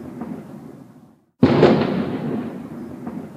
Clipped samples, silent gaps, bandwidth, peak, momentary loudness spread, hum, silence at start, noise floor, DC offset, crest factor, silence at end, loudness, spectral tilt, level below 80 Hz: under 0.1%; none; 9.2 kHz; 0 dBFS; 22 LU; none; 0 s; -50 dBFS; under 0.1%; 22 dB; 0 s; -19 LUFS; -8.5 dB/octave; -52 dBFS